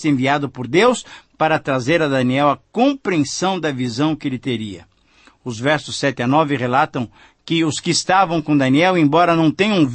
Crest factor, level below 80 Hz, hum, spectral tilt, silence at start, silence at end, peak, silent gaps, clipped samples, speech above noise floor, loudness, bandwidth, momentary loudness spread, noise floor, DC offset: 16 dB; -56 dBFS; none; -5 dB/octave; 0 s; 0 s; -2 dBFS; none; under 0.1%; 35 dB; -17 LUFS; 8.8 kHz; 9 LU; -52 dBFS; under 0.1%